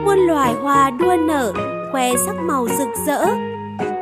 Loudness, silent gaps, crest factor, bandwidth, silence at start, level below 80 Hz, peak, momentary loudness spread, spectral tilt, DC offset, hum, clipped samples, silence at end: -18 LUFS; none; 14 dB; 15.5 kHz; 0 s; -48 dBFS; -4 dBFS; 9 LU; -4.5 dB/octave; under 0.1%; none; under 0.1%; 0 s